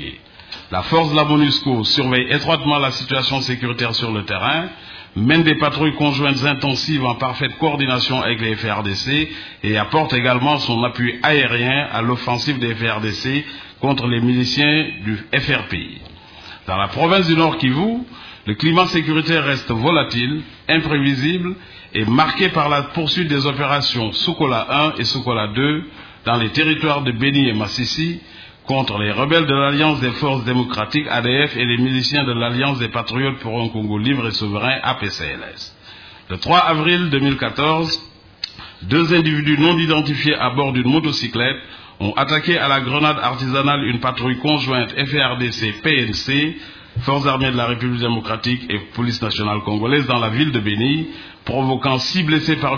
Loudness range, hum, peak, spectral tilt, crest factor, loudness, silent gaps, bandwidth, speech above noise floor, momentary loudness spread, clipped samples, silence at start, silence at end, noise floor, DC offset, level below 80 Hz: 2 LU; none; 0 dBFS; -6 dB/octave; 18 dB; -17 LUFS; none; 5.4 kHz; 23 dB; 10 LU; under 0.1%; 0 s; 0 s; -41 dBFS; under 0.1%; -46 dBFS